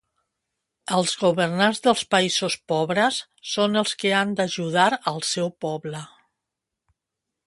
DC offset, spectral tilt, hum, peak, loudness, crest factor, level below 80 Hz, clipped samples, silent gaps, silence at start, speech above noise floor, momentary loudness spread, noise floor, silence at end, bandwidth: under 0.1%; -3.5 dB/octave; none; -4 dBFS; -22 LUFS; 20 dB; -68 dBFS; under 0.1%; none; 0.9 s; 61 dB; 10 LU; -84 dBFS; 1.4 s; 11.5 kHz